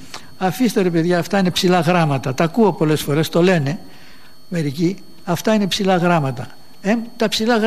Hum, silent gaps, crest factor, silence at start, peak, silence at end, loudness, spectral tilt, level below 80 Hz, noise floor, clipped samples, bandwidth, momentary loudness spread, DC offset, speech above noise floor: none; none; 16 dB; 0 s; -2 dBFS; 0 s; -18 LUFS; -5.5 dB/octave; -54 dBFS; -46 dBFS; under 0.1%; 15.5 kHz; 10 LU; 2%; 29 dB